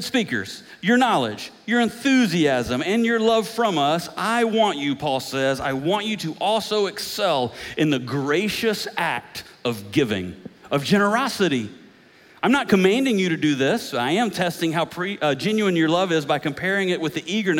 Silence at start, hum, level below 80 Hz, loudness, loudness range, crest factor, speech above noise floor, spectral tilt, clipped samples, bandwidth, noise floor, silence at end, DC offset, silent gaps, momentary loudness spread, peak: 0 s; none; -60 dBFS; -22 LUFS; 3 LU; 16 dB; 29 dB; -5 dB/octave; under 0.1%; 17 kHz; -51 dBFS; 0 s; under 0.1%; none; 8 LU; -6 dBFS